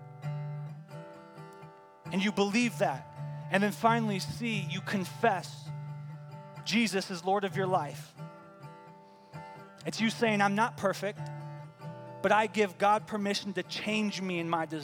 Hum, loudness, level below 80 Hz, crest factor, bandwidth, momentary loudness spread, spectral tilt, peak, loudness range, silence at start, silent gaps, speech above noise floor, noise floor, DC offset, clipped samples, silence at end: none; -31 LUFS; -74 dBFS; 22 dB; 17.5 kHz; 21 LU; -5 dB/octave; -10 dBFS; 4 LU; 0 s; none; 24 dB; -54 dBFS; under 0.1%; under 0.1%; 0 s